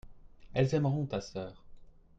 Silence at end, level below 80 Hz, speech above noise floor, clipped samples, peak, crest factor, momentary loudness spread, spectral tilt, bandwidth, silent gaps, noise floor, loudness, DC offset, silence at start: 0.3 s; -56 dBFS; 20 dB; under 0.1%; -14 dBFS; 20 dB; 14 LU; -7.5 dB/octave; 7.8 kHz; none; -52 dBFS; -33 LUFS; under 0.1%; 0.05 s